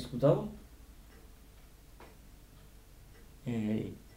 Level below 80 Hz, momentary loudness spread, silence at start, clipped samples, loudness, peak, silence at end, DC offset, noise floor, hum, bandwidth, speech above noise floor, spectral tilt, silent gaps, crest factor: -56 dBFS; 29 LU; 0 s; under 0.1%; -34 LUFS; -14 dBFS; 0 s; under 0.1%; -56 dBFS; none; 16 kHz; 24 dB; -8 dB/octave; none; 24 dB